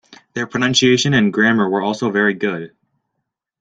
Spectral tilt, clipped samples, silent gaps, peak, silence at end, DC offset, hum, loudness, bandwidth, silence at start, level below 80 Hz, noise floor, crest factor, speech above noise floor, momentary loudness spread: -4.5 dB/octave; under 0.1%; none; -2 dBFS; 0.95 s; under 0.1%; none; -16 LUFS; 9.2 kHz; 0.1 s; -54 dBFS; -77 dBFS; 16 dB; 60 dB; 14 LU